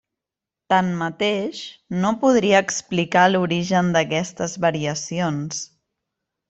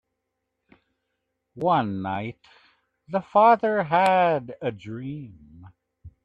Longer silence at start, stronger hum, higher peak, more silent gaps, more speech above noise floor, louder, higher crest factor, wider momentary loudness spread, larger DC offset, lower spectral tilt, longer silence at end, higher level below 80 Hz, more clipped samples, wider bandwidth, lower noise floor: second, 0.7 s vs 1.55 s; neither; first, -2 dBFS vs -6 dBFS; neither; first, 67 dB vs 57 dB; about the same, -21 LUFS vs -23 LUFS; about the same, 20 dB vs 20 dB; second, 12 LU vs 18 LU; neither; second, -4.5 dB/octave vs -7 dB/octave; first, 0.85 s vs 0.15 s; about the same, -60 dBFS vs -64 dBFS; neither; second, 8.2 kHz vs 11 kHz; first, -87 dBFS vs -80 dBFS